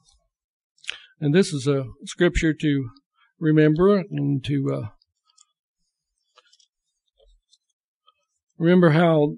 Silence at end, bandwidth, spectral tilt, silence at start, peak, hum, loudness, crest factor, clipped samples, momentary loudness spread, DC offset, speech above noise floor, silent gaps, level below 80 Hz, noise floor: 0 s; 11.5 kHz; -7 dB/octave; 0.85 s; -6 dBFS; none; -21 LUFS; 18 dB; under 0.1%; 18 LU; under 0.1%; 59 dB; 3.06-3.11 s, 5.59-5.75 s, 6.69-6.73 s, 7.73-8.01 s, 8.43-8.47 s; -44 dBFS; -78 dBFS